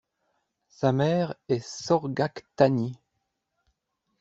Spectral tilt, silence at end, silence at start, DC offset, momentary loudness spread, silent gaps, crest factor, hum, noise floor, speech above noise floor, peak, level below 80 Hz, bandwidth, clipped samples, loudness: -6.5 dB/octave; 1.25 s; 0.8 s; under 0.1%; 7 LU; none; 24 dB; none; -79 dBFS; 54 dB; -4 dBFS; -64 dBFS; 8 kHz; under 0.1%; -26 LUFS